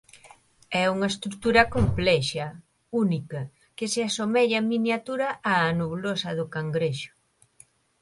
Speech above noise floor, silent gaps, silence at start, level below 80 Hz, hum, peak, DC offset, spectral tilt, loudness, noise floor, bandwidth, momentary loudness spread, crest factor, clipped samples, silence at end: 33 dB; none; 0.25 s; -46 dBFS; none; -4 dBFS; under 0.1%; -5 dB/octave; -25 LUFS; -58 dBFS; 11.5 kHz; 12 LU; 22 dB; under 0.1%; 0.95 s